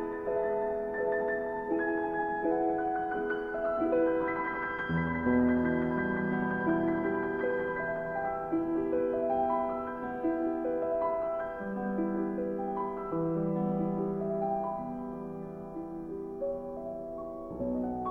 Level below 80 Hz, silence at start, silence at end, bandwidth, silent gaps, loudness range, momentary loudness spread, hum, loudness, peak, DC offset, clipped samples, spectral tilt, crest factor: -56 dBFS; 0 s; 0 s; 4.1 kHz; none; 5 LU; 10 LU; none; -32 LUFS; -16 dBFS; under 0.1%; under 0.1%; -10 dB/octave; 16 dB